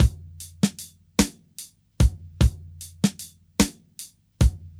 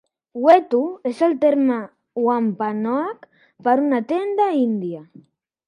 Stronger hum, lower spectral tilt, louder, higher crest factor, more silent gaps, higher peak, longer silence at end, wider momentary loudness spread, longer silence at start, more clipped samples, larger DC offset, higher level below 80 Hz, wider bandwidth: neither; second, -5 dB/octave vs -7.5 dB/octave; second, -25 LUFS vs -20 LUFS; about the same, 22 dB vs 20 dB; neither; second, -4 dBFS vs 0 dBFS; second, 0.1 s vs 0.65 s; about the same, 17 LU vs 15 LU; second, 0 s vs 0.35 s; neither; neither; first, -28 dBFS vs -76 dBFS; first, 15.5 kHz vs 10.5 kHz